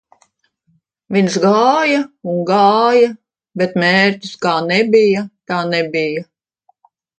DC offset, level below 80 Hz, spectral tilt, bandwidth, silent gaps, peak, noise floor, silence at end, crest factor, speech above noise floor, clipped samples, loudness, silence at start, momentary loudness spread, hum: under 0.1%; -64 dBFS; -5.5 dB/octave; 9.2 kHz; none; 0 dBFS; -62 dBFS; 0.95 s; 16 dB; 48 dB; under 0.1%; -14 LUFS; 1.1 s; 9 LU; none